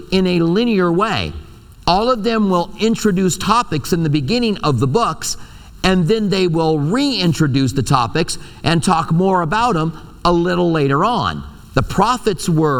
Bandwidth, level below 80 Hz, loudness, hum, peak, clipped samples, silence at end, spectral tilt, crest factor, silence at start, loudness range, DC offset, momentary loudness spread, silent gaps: 18 kHz; -36 dBFS; -16 LUFS; none; 0 dBFS; under 0.1%; 0 s; -5.5 dB/octave; 16 dB; 0 s; 1 LU; under 0.1%; 6 LU; none